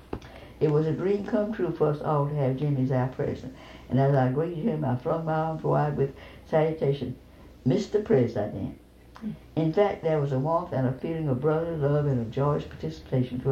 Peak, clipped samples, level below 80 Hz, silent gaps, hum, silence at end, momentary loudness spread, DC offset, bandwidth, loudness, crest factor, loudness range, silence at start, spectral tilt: -10 dBFS; under 0.1%; -52 dBFS; none; none; 0 s; 13 LU; under 0.1%; 7.4 kHz; -27 LUFS; 16 dB; 2 LU; 0.1 s; -9 dB/octave